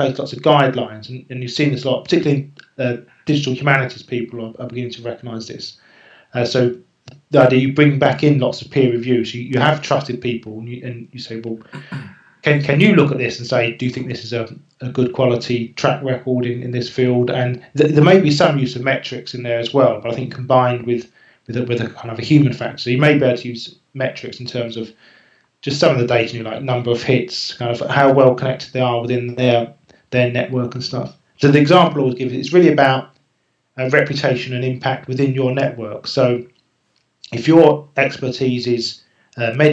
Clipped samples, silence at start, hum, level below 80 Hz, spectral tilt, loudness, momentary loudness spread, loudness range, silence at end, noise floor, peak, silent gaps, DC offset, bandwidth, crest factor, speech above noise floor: under 0.1%; 0 s; none; -60 dBFS; -6.5 dB/octave; -17 LUFS; 16 LU; 5 LU; 0 s; -66 dBFS; 0 dBFS; none; under 0.1%; 8 kHz; 18 dB; 50 dB